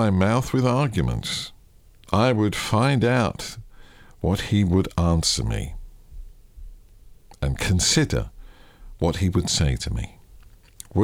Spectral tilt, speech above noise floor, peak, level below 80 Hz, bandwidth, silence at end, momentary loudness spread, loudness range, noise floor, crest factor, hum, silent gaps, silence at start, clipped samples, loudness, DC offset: -5 dB/octave; 29 dB; -6 dBFS; -36 dBFS; 16.5 kHz; 0 s; 13 LU; 4 LU; -51 dBFS; 18 dB; none; none; 0 s; under 0.1%; -22 LUFS; under 0.1%